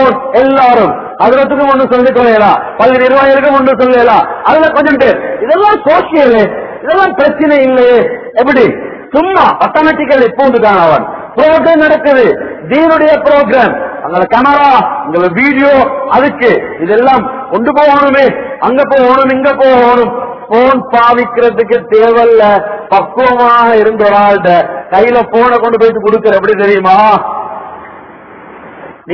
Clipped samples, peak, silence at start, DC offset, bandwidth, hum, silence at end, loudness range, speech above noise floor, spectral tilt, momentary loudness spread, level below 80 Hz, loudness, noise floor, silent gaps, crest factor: 4%; 0 dBFS; 0 s; under 0.1%; 5.4 kHz; none; 0 s; 1 LU; 24 dB; -7.5 dB/octave; 6 LU; -42 dBFS; -7 LUFS; -31 dBFS; none; 8 dB